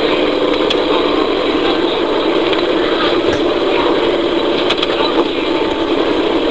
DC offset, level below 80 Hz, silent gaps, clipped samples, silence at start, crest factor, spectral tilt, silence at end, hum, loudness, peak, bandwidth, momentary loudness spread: 2%; -40 dBFS; none; under 0.1%; 0 s; 14 dB; -5 dB/octave; 0 s; none; -14 LUFS; 0 dBFS; 8 kHz; 1 LU